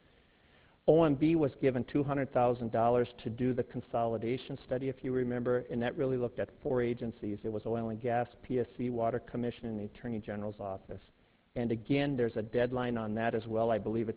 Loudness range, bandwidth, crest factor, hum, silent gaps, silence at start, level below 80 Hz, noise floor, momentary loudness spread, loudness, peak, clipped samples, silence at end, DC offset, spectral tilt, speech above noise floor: 6 LU; 4 kHz; 20 dB; none; none; 0.85 s; -60 dBFS; -65 dBFS; 10 LU; -33 LUFS; -14 dBFS; under 0.1%; 0 s; under 0.1%; -6.5 dB/octave; 32 dB